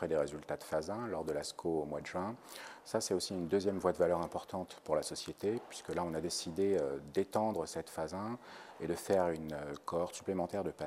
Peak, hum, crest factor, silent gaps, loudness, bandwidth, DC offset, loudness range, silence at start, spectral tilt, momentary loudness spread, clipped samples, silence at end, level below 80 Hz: -16 dBFS; none; 20 dB; none; -37 LUFS; 15.5 kHz; under 0.1%; 2 LU; 0 s; -5 dB/octave; 10 LU; under 0.1%; 0 s; -66 dBFS